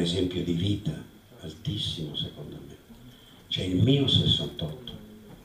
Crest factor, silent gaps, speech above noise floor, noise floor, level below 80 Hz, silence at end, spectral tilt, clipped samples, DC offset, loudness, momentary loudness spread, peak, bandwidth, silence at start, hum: 20 dB; none; 23 dB; -51 dBFS; -50 dBFS; 0 s; -6 dB/octave; under 0.1%; under 0.1%; -27 LUFS; 22 LU; -10 dBFS; 15.5 kHz; 0 s; none